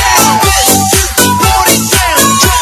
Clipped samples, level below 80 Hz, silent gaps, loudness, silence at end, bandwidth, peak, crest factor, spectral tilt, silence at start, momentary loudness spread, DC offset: 1%; -22 dBFS; none; -7 LUFS; 0 s; over 20 kHz; 0 dBFS; 8 dB; -2.5 dB/octave; 0 s; 2 LU; under 0.1%